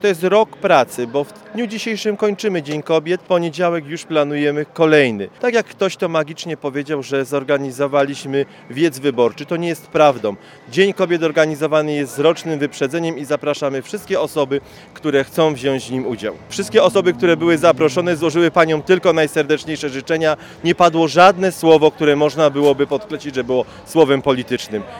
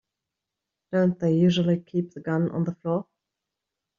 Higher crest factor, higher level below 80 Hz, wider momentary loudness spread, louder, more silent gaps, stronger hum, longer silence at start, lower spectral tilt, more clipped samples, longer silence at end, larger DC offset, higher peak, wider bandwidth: about the same, 16 dB vs 16 dB; first, -56 dBFS vs -66 dBFS; about the same, 10 LU vs 9 LU; first, -17 LUFS vs -25 LUFS; neither; neither; second, 0 s vs 0.9 s; second, -5 dB/octave vs -7 dB/octave; neither; second, 0 s vs 0.95 s; neither; first, 0 dBFS vs -10 dBFS; first, 17.5 kHz vs 7.2 kHz